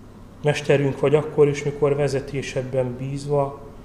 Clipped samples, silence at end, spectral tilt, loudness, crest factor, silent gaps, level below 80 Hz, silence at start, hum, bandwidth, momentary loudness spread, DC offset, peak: under 0.1%; 0 s; -6.5 dB/octave; -22 LUFS; 18 dB; none; -46 dBFS; 0 s; none; 11.5 kHz; 8 LU; 0.1%; -4 dBFS